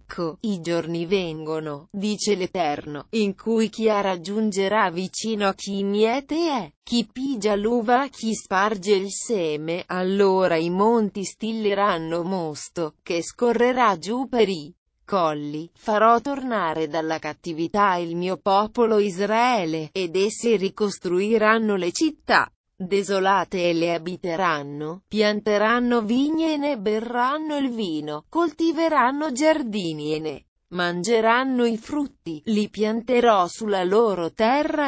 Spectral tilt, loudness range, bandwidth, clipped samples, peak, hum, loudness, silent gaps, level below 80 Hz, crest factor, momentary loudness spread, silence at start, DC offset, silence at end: -5 dB/octave; 2 LU; 8 kHz; under 0.1%; -4 dBFS; none; -23 LUFS; 6.76-6.82 s, 14.78-14.86 s, 22.56-22.64 s, 30.48-30.56 s; -60 dBFS; 18 dB; 9 LU; 0.1 s; under 0.1%; 0 s